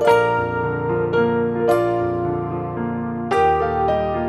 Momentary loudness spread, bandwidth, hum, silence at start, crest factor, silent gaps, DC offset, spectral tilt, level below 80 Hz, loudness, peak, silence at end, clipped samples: 8 LU; 12.5 kHz; none; 0 s; 16 dB; none; under 0.1%; -7.5 dB/octave; -42 dBFS; -20 LUFS; -4 dBFS; 0 s; under 0.1%